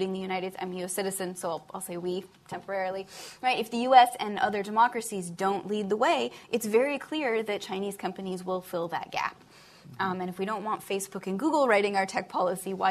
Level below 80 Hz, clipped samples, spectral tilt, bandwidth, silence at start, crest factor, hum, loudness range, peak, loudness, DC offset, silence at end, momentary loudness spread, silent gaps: -72 dBFS; under 0.1%; -4 dB/octave; 14 kHz; 0 s; 24 dB; none; 8 LU; -6 dBFS; -29 LUFS; under 0.1%; 0 s; 11 LU; none